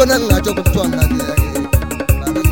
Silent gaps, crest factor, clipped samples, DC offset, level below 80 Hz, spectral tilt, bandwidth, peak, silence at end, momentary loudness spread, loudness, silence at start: none; 14 dB; under 0.1%; 0.8%; -20 dBFS; -5.5 dB/octave; 17 kHz; 0 dBFS; 0 s; 4 LU; -16 LUFS; 0 s